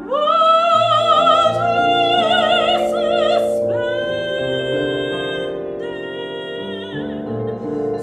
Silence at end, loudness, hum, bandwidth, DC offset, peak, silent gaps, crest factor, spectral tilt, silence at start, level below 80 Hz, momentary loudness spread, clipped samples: 0 s; -17 LUFS; none; 12.5 kHz; under 0.1%; -2 dBFS; none; 16 dB; -5 dB/octave; 0 s; -52 dBFS; 14 LU; under 0.1%